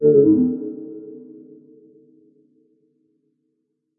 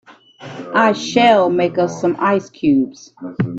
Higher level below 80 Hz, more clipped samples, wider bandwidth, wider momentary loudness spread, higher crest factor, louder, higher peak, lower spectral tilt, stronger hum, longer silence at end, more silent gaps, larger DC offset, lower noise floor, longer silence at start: second, -66 dBFS vs -58 dBFS; neither; second, 1.7 kHz vs 8 kHz; first, 27 LU vs 19 LU; about the same, 18 dB vs 16 dB; about the same, -17 LUFS vs -16 LUFS; second, -4 dBFS vs 0 dBFS; first, -16.5 dB/octave vs -5.5 dB/octave; neither; first, 2.8 s vs 0 s; neither; neither; first, -74 dBFS vs -37 dBFS; about the same, 0 s vs 0.1 s